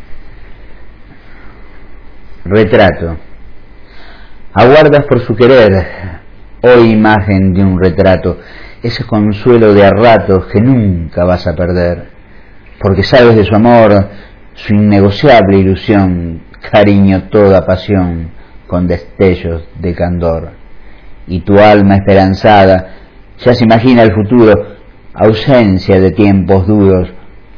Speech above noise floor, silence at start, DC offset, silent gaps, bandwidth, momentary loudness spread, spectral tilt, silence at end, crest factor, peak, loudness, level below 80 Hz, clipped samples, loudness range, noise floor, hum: 27 dB; 0 s; 0.9%; none; 5.4 kHz; 14 LU; -9 dB/octave; 0.3 s; 8 dB; 0 dBFS; -8 LUFS; -30 dBFS; 3%; 7 LU; -34 dBFS; none